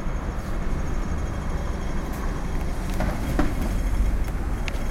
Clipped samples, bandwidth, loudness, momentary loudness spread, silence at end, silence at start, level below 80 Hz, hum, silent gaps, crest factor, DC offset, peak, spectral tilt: under 0.1%; 16 kHz; -29 LUFS; 4 LU; 0 s; 0 s; -26 dBFS; none; none; 14 dB; under 0.1%; -10 dBFS; -6.5 dB/octave